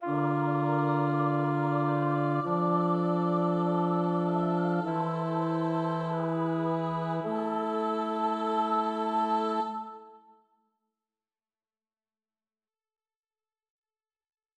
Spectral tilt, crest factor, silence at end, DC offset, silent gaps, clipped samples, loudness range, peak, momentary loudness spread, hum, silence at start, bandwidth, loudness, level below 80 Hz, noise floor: -9 dB/octave; 16 dB; 4.4 s; under 0.1%; none; under 0.1%; 6 LU; -14 dBFS; 4 LU; none; 0 s; 8 kHz; -29 LUFS; -82 dBFS; under -90 dBFS